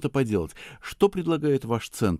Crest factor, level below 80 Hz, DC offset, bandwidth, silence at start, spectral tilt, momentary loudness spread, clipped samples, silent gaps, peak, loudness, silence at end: 20 dB; -48 dBFS; under 0.1%; 15.5 kHz; 0 s; -6.5 dB/octave; 14 LU; under 0.1%; none; -6 dBFS; -25 LUFS; 0 s